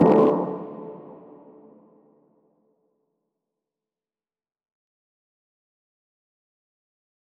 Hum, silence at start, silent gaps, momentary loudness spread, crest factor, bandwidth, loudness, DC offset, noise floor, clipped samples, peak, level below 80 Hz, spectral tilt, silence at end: none; 0 s; none; 27 LU; 24 dB; 5.6 kHz; -22 LUFS; under 0.1%; under -90 dBFS; under 0.1%; -6 dBFS; -68 dBFS; -10 dB/octave; 6.4 s